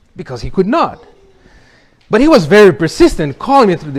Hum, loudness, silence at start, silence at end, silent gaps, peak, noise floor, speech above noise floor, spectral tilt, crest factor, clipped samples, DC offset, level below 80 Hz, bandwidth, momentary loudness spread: none; -10 LUFS; 0.2 s; 0 s; none; 0 dBFS; -47 dBFS; 37 dB; -6 dB/octave; 12 dB; 2%; under 0.1%; -32 dBFS; 14.5 kHz; 13 LU